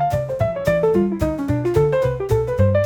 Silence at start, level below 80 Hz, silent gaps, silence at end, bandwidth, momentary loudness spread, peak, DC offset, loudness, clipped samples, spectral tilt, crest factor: 0 s; -34 dBFS; none; 0 s; 18.5 kHz; 4 LU; -4 dBFS; 0.1%; -19 LUFS; under 0.1%; -8 dB/octave; 14 dB